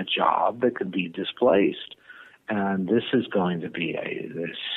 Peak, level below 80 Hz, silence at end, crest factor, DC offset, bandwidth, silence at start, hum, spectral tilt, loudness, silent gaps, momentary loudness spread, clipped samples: -6 dBFS; -68 dBFS; 0 s; 18 dB; under 0.1%; 4.2 kHz; 0 s; none; -8.5 dB/octave; -25 LUFS; none; 11 LU; under 0.1%